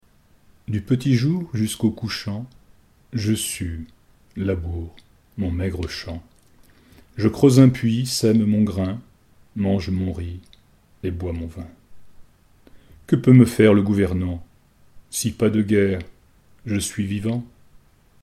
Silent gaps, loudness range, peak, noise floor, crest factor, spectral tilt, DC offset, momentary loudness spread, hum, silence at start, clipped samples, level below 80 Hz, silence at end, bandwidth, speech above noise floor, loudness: none; 9 LU; 0 dBFS; -55 dBFS; 22 dB; -6.5 dB/octave; under 0.1%; 21 LU; none; 0.7 s; under 0.1%; -44 dBFS; 0.75 s; 15 kHz; 35 dB; -21 LUFS